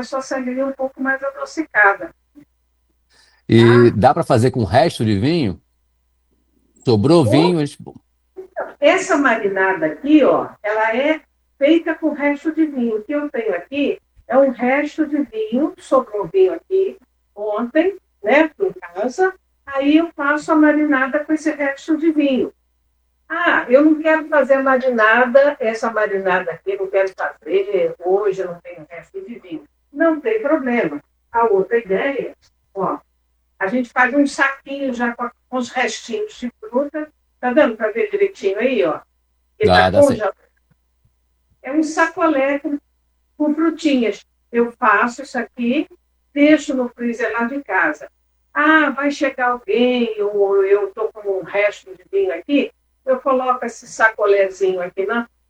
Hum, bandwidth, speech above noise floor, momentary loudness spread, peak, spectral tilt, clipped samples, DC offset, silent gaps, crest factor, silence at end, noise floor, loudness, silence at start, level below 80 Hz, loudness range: none; 12 kHz; 47 dB; 13 LU; 0 dBFS; -6 dB/octave; under 0.1%; under 0.1%; none; 18 dB; 0.25 s; -64 dBFS; -17 LUFS; 0 s; -56 dBFS; 5 LU